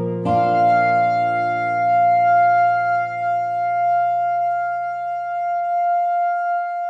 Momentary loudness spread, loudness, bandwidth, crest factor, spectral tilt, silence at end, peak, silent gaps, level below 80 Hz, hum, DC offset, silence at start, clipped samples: 8 LU; -19 LUFS; 6 kHz; 10 dB; -7.5 dB/octave; 0 s; -8 dBFS; none; -64 dBFS; none; under 0.1%; 0 s; under 0.1%